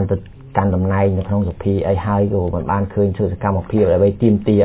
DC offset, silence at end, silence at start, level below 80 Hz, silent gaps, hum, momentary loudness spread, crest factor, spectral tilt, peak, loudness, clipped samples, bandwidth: under 0.1%; 0 s; 0 s; -32 dBFS; none; none; 6 LU; 14 dB; -13 dB/octave; -2 dBFS; -18 LUFS; under 0.1%; 4 kHz